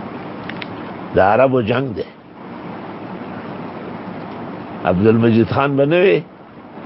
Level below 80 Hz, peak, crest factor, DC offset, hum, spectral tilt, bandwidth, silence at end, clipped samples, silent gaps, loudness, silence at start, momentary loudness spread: -46 dBFS; 0 dBFS; 18 dB; under 0.1%; none; -12 dB/octave; 5.8 kHz; 0 s; under 0.1%; none; -16 LUFS; 0 s; 18 LU